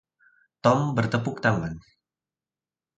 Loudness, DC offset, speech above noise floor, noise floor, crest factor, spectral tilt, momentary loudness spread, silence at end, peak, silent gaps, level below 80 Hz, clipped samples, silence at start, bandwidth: -25 LUFS; under 0.1%; over 66 dB; under -90 dBFS; 22 dB; -7 dB/octave; 11 LU; 1.2 s; -4 dBFS; none; -54 dBFS; under 0.1%; 0.65 s; 9 kHz